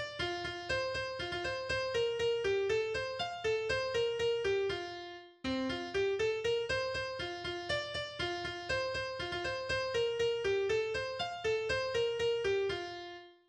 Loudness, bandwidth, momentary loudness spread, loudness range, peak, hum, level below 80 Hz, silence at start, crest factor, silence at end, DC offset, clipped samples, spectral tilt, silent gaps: -35 LUFS; 10 kHz; 6 LU; 2 LU; -20 dBFS; none; -58 dBFS; 0 s; 14 dB; 0.15 s; under 0.1%; under 0.1%; -4 dB/octave; none